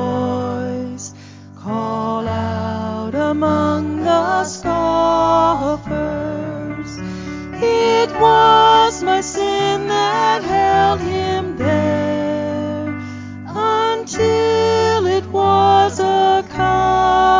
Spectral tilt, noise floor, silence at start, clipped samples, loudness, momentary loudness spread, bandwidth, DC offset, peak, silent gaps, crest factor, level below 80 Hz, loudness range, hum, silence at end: -5 dB/octave; -37 dBFS; 0 s; under 0.1%; -16 LUFS; 13 LU; 7.6 kHz; under 0.1%; 0 dBFS; none; 16 dB; -38 dBFS; 6 LU; none; 0 s